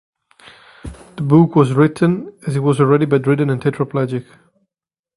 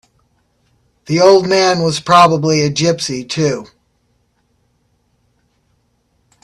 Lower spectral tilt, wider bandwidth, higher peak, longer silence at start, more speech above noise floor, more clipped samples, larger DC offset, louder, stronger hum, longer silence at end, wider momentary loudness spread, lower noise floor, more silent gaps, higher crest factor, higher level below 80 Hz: first, -8.5 dB/octave vs -4.5 dB/octave; about the same, 11.5 kHz vs 12.5 kHz; about the same, 0 dBFS vs 0 dBFS; second, 0.85 s vs 1.1 s; first, 75 dB vs 49 dB; neither; neither; second, -16 LUFS vs -13 LUFS; neither; second, 0.95 s vs 2.8 s; first, 17 LU vs 10 LU; first, -90 dBFS vs -61 dBFS; neither; about the same, 16 dB vs 16 dB; first, -48 dBFS vs -54 dBFS